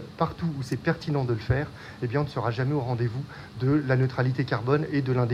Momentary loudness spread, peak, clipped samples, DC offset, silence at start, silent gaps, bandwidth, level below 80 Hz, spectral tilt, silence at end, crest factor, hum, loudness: 6 LU; -10 dBFS; under 0.1%; under 0.1%; 0 s; none; 9.4 kHz; -50 dBFS; -8 dB/octave; 0 s; 18 dB; none; -27 LUFS